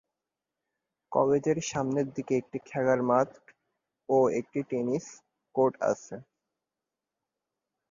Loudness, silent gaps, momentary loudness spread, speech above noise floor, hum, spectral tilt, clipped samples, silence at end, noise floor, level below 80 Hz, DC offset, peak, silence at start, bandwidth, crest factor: -29 LUFS; none; 10 LU; 61 dB; none; -6 dB/octave; under 0.1%; 1.7 s; -89 dBFS; -70 dBFS; under 0.1%; -10 dBFS; 1.1 s; 7.4 kHz; 20 dB